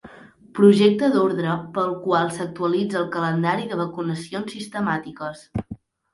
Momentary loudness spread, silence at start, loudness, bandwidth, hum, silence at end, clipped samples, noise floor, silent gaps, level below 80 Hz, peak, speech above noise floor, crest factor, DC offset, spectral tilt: 16 LU; 0.05 s; -22 LUFS; 11.5 kHz; none; 0.4 s; under 0.1%; -46 dBFS; none; -54 dBFS; -2 dBFS; 25 dB; 20 dB; under 0.1%; -6.5 dB/octave